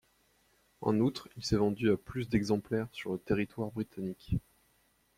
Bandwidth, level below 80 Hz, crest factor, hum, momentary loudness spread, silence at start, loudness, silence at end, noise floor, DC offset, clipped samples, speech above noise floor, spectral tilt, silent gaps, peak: 15.5 kHz; -54 dBFS; 18 dB; none; 8 LU; 0.8 s; -33 LUFS; 0.8 s; -71 dBFS; under 0.1%; under 0.1%; 39 dB; -6.5 dB/octave; none; -16 dBFS